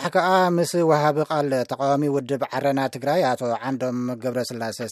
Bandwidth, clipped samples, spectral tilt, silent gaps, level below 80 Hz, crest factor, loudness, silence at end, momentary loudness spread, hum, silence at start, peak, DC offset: 15.5 kHz; under 0.1%; -5.5 dB/octave; none; -74 dBFS; 18 dB; -22 LUFS; 0 s; 8 LU; none; 0 s; -4 dBFS; under 0.1%